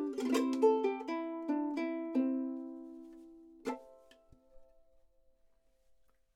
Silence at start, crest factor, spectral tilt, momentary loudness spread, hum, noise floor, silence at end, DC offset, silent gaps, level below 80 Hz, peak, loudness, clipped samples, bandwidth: 0 s; 20 dB; -4 dB/octave; 20 LU; none; -72 dBFS; 1.7 s; under 0.1%; none; -74 dBFS; -16 dBFS; -35 LUFS; under 0.1%; 15 kHz